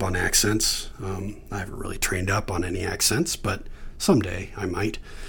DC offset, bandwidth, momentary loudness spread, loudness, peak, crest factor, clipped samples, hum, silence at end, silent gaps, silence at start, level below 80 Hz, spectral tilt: under 0.1%; 19 kHz; 13 LU; -25 LUFS; -6 dBFS; 20 dB; under 0.1%; none; 0 s; none; 0 s; -38 dBFS; -3.5 dB/octave